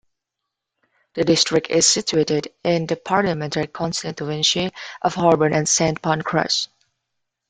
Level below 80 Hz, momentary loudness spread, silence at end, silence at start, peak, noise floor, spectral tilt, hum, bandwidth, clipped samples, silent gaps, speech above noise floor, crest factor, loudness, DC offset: -54 dBFS; 9 LU; 0.85 s; 1.15 s; -2 dBFS; -82 dBFS; -3.5 dB/octave; none; 10 kHz; under 0.1%; none; 62 dB; 20 dB; -19 LUFS; under 0.1%